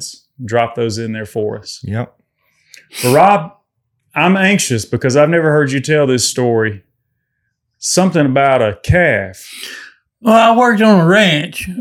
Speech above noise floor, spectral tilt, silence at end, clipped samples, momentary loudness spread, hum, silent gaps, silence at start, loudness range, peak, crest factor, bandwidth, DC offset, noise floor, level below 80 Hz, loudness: 57 dB; -5 dB/octave; 0 s; under 0.1%; 18 LU; none; none; 0 s; 5 LU; 0 dBFS; 14 dB; 18 kHz; under 0.1%; -70 dBFS; -42 dBFS; -13 LUFS